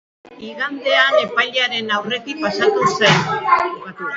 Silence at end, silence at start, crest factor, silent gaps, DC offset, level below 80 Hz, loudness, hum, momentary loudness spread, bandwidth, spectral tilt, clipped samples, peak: 0 s; 0.25 s; 18 dB; none; under 0.1%; -58 dBFS; -17 LUFS; none; 11 LU; 8 kHz; -3.5 dB/octave; under 0.1%; 0 dBFS